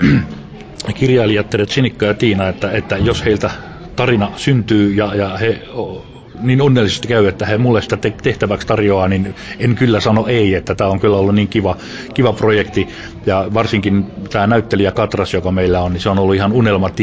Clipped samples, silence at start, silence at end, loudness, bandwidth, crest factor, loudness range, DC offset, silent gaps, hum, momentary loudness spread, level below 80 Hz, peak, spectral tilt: under 0.1%; 0 s; 0 s; -15 LUFS; 8 kHz; 14 dB; 2 LU; 0.3%; none; none; 9 LU; -34 dBFS; 0 dBFS; -7 dB/octave